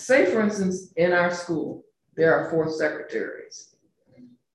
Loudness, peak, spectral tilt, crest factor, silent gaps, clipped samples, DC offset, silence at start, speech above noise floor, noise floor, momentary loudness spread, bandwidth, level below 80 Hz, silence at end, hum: -24 LUFS; -6 dBFS; -5.5 dB/octave; 18 dB; none; under 0.1%; under 0.1%; 0 s; 34 dB; -57 dBFS; 20 LU; 11.5 kHz; -64 dBFS; 0.3 s; none